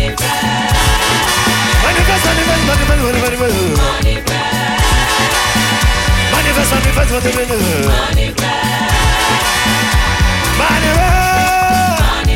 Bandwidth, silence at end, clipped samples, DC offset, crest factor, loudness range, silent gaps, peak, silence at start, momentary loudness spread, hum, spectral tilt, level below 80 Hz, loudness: 17 kHz; 0 s; under 0.1%; under 0.1%; 10 dB; 1 LU; none; -2 dBFS; 0 s; 3 LU; none; -3.5 dB/octave; -18 dBFS; -12 LUFS